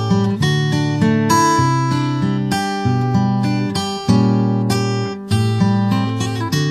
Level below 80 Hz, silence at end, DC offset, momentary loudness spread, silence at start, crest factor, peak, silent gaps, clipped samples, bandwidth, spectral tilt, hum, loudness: -48 dBFS; 0 s; under 0.1%; 6 LU; 0 s; 14 dB; -2 dBFS; none; under 0.1%; 14 kHz; -6 dB/octave; none; -17 LUFS